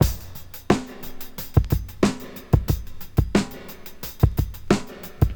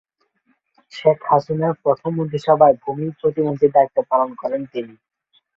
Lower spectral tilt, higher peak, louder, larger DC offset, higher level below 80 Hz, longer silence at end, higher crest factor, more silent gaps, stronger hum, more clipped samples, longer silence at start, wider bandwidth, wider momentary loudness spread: second, -6.5 dB/octave vs -8.5 dB/octave; about the same, -2 dBFS vs -2 dBFS; second, -24 LUFS vs -19 LUFS; neither; first, -30 dBFS vs -62 dBFS; second, 0 s vs 0.7 s; about the same, 22 dB vs 18 dB; neither; neither; neither; second, 0 s vs 0.95 s; first, over 20 kHz vs 7.4 kHz; first, 15 LU vs 12 LU